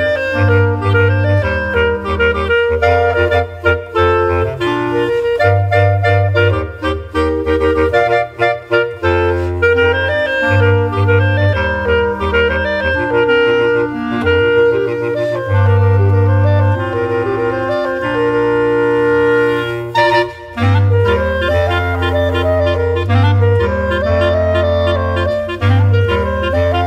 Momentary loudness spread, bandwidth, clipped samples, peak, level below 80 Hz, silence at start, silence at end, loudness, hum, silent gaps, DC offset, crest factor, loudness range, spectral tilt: 5 LU; 8 kHz; under 0.1%; 0 dBFS; -30 dBFS; 0 s; 0 s; -14 LUFS; none; none; under 0.1%; 12 dB; 1 LU; -7.5 dB/octave